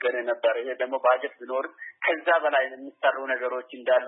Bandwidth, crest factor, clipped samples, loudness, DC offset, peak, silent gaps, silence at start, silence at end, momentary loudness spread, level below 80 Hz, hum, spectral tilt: 4 kHz; 16 dB; under 0.1%; -26 LUFS; under 0.1%; -10 dBFS; none; 0 s; 0 s; 9 LU; under -90 dBFS; none; -5.5 dB/octave